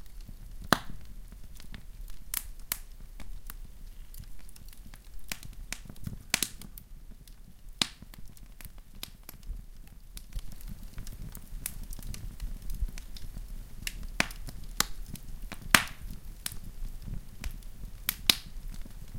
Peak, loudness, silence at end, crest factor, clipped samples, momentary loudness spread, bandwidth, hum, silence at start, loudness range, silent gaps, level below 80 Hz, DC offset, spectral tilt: 0 dBFS; -34 LUFS; 0 s; 36 dB; under 0.1%; 22 LU; 17 kHz; none; 0 s; 13 LU; none; -42 dBFS; under 0.1%; -2 dB/octave